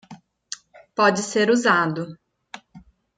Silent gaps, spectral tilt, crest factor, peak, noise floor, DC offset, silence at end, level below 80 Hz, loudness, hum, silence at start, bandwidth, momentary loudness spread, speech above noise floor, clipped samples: none; -4 dB/octave; 18 dB; -4 dBFS; -50 dBFS; under 0.1%; 0.4 s; -66 dBFS; -20 LUFS; none; 0.1 s; 9.6 kHz; 24 LU; 30 dB; under 0.1%